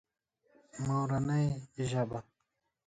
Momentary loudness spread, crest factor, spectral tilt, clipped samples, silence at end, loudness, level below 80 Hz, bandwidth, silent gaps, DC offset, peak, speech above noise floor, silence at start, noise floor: 10 LU; 16 dB; -7 dB/octave; under 0.1%; 0.65 s; -34 LUFS; -62 dBFS; 9.2 kHz; none; under 0.1%; -20 dBFS; 50 dB; 0.75 s; -83 dBFS